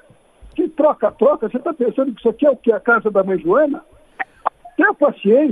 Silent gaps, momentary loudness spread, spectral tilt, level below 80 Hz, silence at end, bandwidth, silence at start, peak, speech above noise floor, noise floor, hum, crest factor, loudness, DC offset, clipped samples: none; 10 LU; -8.5 dB/octave; -54 dBFS; 0 s; 3.8 kHz; 0.45 s; 0 dBFS; 30 dB; -46 dBFS; none; 16 dB; -17 LUFS; under 0.1%; under 0.1%